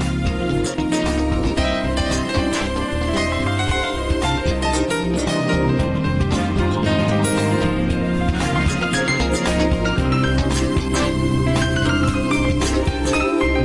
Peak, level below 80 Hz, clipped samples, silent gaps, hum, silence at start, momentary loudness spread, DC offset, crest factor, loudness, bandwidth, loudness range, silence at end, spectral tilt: -6 dBFS; -28 dBFS; under 0.1%; none; none; 0 s; 3 LU; under 0.1%; 12 dB; -19 LUFS; 11.5 kHz; 2 LU; 0 s; -5.5 dB/octave